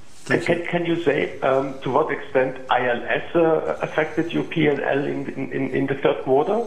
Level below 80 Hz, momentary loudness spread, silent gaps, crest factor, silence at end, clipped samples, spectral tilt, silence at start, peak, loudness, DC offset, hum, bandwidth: -56 dBFS; 5 LU; none; 18 dB; 0 s; under 0.1%; -6.5 dB/octave; 0.25 s; -4 dBFS; -22 LUFS; 1%; none; 11 kHz